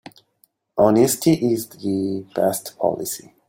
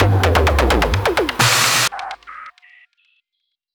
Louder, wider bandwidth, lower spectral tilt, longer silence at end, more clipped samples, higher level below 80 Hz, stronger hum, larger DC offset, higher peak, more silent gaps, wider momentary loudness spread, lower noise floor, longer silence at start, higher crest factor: second, -20 LUFS vs -15 LUFS; second, 17 kHz vs over 20 kHz; first, -5.5 dB/octave vs -3.5 dB/octave; second, 0.3 s vs 1.25 s; neither; second, -58 dBFS vs -26 dBFS; neither; neither; about the same, -2 dBFS vs -2 dBFS; neither; second, 11 LU vs 19 LU; second, -63 dBFS vs -76 dBFS; first, 0.75 s vs 0 s; about the same, 18 dB vs 16 dB